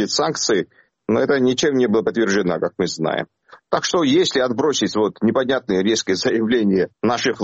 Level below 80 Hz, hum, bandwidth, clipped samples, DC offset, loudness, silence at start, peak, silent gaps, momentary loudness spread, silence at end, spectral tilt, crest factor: -58 dBFS; none; 8.2 kHz; under 0.1%; under 0.1%; -19 LUFS; 0 s; -4 dBFS; none; 6 LU; 0 s; -4 dB/octave; 16 dB